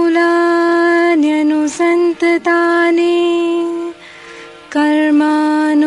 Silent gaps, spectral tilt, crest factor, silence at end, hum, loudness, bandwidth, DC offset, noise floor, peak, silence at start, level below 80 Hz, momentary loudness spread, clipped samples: none; -3.5 dB/octave; 10 dB; 0 s; none; -13 LUFS; 11 kHz; under 0.1%; -35 dBFS; -2 dBFS; 0 s; -60 dBFS; 11 LU; under 0.1%